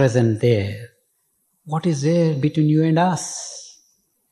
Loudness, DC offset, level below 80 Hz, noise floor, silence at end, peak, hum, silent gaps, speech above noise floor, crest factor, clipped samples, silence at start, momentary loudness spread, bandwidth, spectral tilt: -20 LUFS; under 0.1%; -52 dBFS; -68 dBFS; 0.65 s; -4 dBFS; none; none; 49 dB; 16 dB; under 0.1%; 0 s; 13 LU; 12 kHz; -6.5 dB/octave